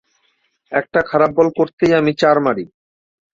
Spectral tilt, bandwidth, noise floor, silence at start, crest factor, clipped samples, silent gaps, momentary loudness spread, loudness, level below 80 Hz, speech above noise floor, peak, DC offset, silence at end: -6.5 dB/octave; 7.8 kHz; -64 dBFS; 0.7 s; 16 dB; under 0.1%; 1.73-1.78 s; 8 LU; -16 LUFS; -54 dBFS; 49 dB; -2 dBFS; under 0.1%; 0.65 s